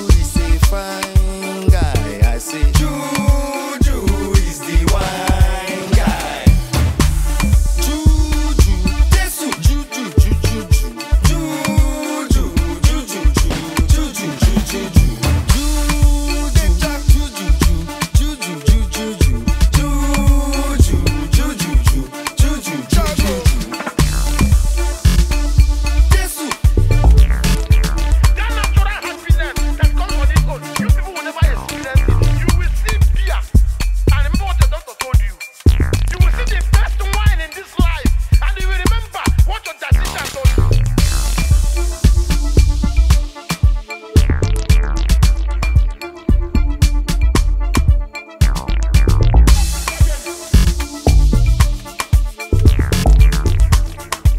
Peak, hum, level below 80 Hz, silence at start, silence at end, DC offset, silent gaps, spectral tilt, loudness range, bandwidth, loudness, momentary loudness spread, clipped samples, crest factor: 0 dBFS; none; -14 dBFS; 0 s; 0 s; under 0.1%; none; -5 dB/octave; 2 LU; 16 kHz; -16 LUFS; 5 LU; under 0.1%; 14 dB